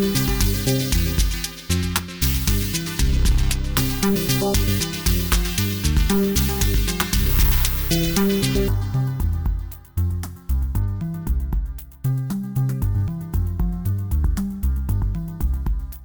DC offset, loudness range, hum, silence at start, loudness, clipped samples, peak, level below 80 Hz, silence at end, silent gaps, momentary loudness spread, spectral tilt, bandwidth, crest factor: 0.2%; 6 LU; none; 0 s; -22 LUFS; under 0.1%; 0 dBFS; -24 dBFS; 0 s; none; 7 LU; -4.5 dB/octave; over 20 kHz; 20 dB